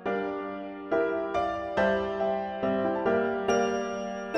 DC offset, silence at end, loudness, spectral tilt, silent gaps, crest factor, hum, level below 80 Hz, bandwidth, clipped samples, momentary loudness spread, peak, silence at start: under 0.1%; 0 s; -29 LUFS; -5.5 dB/octave; none; 16 dB; none; -56 dBFS; 8.4 kHz; under 0.1%; 7 LU; -12 dBFS; 0 s